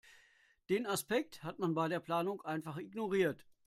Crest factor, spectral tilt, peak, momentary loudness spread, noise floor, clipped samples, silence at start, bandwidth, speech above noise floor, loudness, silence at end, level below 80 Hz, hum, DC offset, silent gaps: 18 dB; -5 dB/octave; -20 dBFS; 7 LU; -69 dBFS; under 0.1%; 0.7 s; 16 kHz; 33 dB; -37 LUFS; 0.25 s; -76 dBFS; none; under 0.1%; none